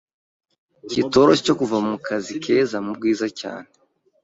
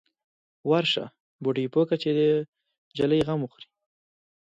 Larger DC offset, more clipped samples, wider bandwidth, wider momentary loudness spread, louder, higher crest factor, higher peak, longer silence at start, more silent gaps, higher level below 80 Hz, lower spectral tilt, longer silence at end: neither; neither; about the same, 8 kHz vs 8 kHz; about the same, 12 LU vs 14 LU; first, -20 LUFS vs -25 LUFS; about the same, 20 dB vs 18 dB; first, -2 dBFS vs -10 dBFS; first, 0.85 s vs 0.65 s; second, none vs 1.20-1.39 s, 2.48-2.53 s, 2.78-2.91 s; first, -58 dBFS vs -64 dBFS; second, -5 dB/octave vs -7 dB/octave; second, 0.6 s vs 1.1 s